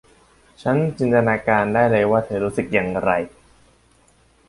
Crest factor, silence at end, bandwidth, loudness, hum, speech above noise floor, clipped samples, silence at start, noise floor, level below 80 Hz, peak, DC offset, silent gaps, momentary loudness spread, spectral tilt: 18 dB; 1.2 s; 11.5 kHz; -19 LUFS; none; 37 dB; under 0.1%; 0.65 s; -56 dBFS; -50 dBFS; -2 dBFS; under 0.1%; none; 7 LU; -7.5 dB/octave